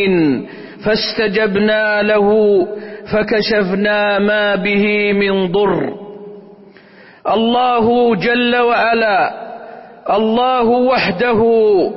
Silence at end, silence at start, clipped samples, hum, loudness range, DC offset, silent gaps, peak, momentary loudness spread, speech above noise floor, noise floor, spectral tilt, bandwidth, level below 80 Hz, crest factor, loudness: 0 s; 0 s; under 0.1%; none; 2 LU; under 0.1%; none; -4 dBFS; 12 LU; 29 dB; -42 dBFS; -9 dB/octave; 5.8 kHz; -48 dBFS; 10 dB; -14 LUFS